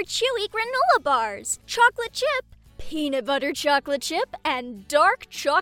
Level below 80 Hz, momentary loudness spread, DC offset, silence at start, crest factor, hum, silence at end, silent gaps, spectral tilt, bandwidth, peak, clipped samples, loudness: -52 dBFS; 8 LU; under 0.1%; 0 s; 18 dB; none; 0 s; none; -1.5 dB/octave; 17.5 kHz; -6 dBFS; under 0.1%; -23 LUFS